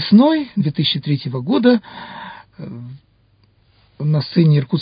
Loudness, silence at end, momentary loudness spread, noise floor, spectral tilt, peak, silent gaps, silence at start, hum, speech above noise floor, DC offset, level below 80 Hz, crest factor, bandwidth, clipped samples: -16 LUFS; 0 s; 20 LU; -56 dBFS; -12.5 dB/octave; 0 dBFS; none; 0 s; none; 40 dB; under 0.1%; -58 dBFS; 16 dB; 5.2 kHz; under 0.1%